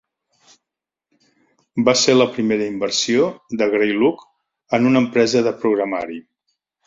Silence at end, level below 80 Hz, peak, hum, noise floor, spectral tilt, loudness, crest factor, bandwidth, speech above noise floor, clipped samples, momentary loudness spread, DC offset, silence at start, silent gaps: 0.65 s; -60 dBFS; -2 dBFS; none; -85 dBFS; -4 dB/octave; -18 LUFS; 18 dB; 7.8 kHz; 68 dB; under 0.1%; 10 LU; under 0.1%; 1.75 s; none